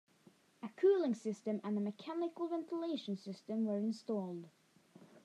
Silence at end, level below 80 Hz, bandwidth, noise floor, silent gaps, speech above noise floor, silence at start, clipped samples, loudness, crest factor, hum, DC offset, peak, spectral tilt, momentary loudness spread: 0.05 s; under -90 dBFS; 10.5 kHz; -68 dBFS; none; 29 dB; 0.6 s; under 0.1%; -38 LUFS; 18 dB; none; under 0.1%; -22 dBFS; -7 dB/octave; 13 LU